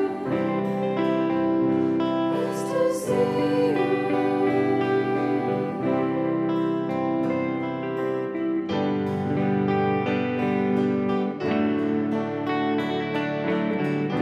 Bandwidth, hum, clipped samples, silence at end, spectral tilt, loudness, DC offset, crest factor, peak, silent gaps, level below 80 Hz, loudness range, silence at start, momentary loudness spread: 13 kHz; none; under 0.1%; 0 s; -7.5 dB/octave; -24 LUFS; under 0.1%; 12 dB; -12 dBFS; none; -66 dBFS; 2 LU; 0 s; 4 LU